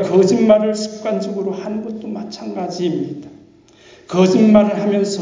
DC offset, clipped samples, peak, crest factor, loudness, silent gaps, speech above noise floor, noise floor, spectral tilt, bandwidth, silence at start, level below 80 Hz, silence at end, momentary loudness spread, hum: under 0.1%; under 0.1%; -2 dBFS; 16 dB; -17 LUFS; none; 31 dB; -46 dBFS; -6.5 dB/octave; 7.6 kHz; 0 s; -56 dBFS; 0 s; 15 LU; none